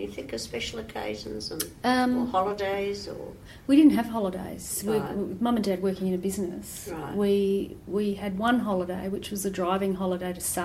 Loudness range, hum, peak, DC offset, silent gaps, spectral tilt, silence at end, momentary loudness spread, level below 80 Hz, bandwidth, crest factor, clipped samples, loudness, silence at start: 4 LU; none; -8 dBFS; under 0.1%; none; -5 dB/octave; 0 s; 11 LU; -52 dBFS; 16 kHz; 18 dB; under 0.1%; -27 LUFS; 0 s